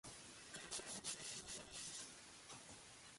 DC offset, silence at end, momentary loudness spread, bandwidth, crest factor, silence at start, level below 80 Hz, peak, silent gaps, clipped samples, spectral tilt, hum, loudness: under 0.1%; 0 s; 10 LU; 11.5 kHz; 24 dB; 0.05 s; -76 dBFS; -30 dBFS; none; under 0.1%; -1 dB/octave; none; -51 LUFS